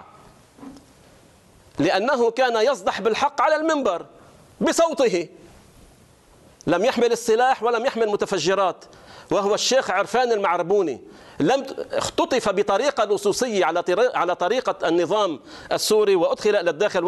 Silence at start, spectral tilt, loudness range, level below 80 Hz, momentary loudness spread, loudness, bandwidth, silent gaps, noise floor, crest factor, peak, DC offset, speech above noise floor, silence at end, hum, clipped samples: 0 s; -3.5 dB/octave; 2 LU; -58 dBFS; 6 LU; -21 LUFS; 12 kHz; none; -52 dBFS; 14 dB; -8 dBFS; under 0.1%; 32 dB; 0 s; none; under 0.1%